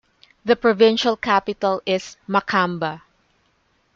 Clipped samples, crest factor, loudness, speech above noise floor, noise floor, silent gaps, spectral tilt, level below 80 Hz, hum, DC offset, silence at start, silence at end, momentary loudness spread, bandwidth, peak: under 0.1%; 18 dB; -20 LUFS; 45 dB; -64 dBFS; none; -5 dB/octave; -60 dBFS; none; under 0.1%; 0.45 s; 1 s; 12 LU; 7.6 kHz; -4 dBFS